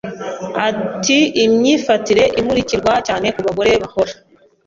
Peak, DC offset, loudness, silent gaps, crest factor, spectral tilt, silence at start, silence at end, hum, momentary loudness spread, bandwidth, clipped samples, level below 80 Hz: -2 dBFS; under 0.1%; -15 LUFS; none; 14 dB; -4 dB/octave; 0.05 s; 0.55 s; none; 7 LU; 7.8 kHz; under 0.1%; -44 dBFS